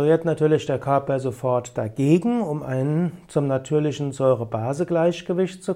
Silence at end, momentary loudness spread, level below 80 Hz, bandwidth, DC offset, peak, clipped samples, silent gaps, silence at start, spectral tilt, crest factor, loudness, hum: 0 s; 6 LU; -58 dBFS; 12 kHz; under 0.1%; -6 dBFS; under 0.1%; none; 0 s; -7.5 dB/octave; 16 dB; -23 LUFS; none